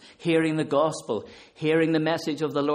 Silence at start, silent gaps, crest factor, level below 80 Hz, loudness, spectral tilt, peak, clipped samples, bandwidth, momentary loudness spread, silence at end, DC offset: 0.05 s; none; 16 dB; -68 dBFS; -25 LUFS; -6 dB/octave; -10 dBFS; under 0.1%; 13 kHz; 9 LU; 0 s; under 0.1%